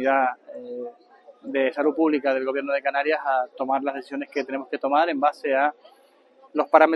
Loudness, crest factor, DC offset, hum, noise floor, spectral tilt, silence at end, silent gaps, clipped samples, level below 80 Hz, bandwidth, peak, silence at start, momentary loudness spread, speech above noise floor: -24 LUFS; 22 dB; under 0.1%; none; -55 dBFS; -5 dB/octave; 0 s; none; under 0.1%; -80 dBFS; 11.5 kHz; -2 dBFS; 0 s; 14 LU; 32 dB